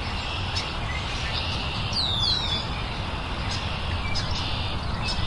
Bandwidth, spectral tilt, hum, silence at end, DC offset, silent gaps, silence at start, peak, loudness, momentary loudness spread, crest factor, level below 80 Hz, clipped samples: 11.5 kHz; -4 dB/octave; none; 0 s; under 0.1%; none; 0 s; -12 dBFS; -27 LUFS; 8 LU; 16 dB; -34 dBFS; under 0.1%